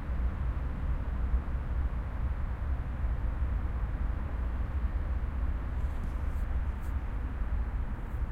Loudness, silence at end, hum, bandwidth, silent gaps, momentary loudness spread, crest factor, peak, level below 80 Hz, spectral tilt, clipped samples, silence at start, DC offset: -35 LUFS; 0 s; none; 4.1 kHz; none; 3 LU; 14 dB; -18 dBFS; -32 dBFS; -8.5 dB/octave; under 0.1%; 0 s; under 0.1%